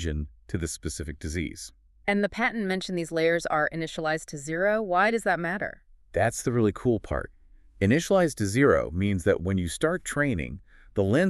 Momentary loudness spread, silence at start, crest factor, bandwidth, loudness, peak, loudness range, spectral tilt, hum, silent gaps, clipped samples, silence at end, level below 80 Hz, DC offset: 11 LU; 0 s; 18 dB; 13.5 kHz; -27 LUFS; -8 dBFS; 3 LU; -5.5 dB/octave; none; none; under 0.1%; 0 s; -44 dBFS; under 0.1%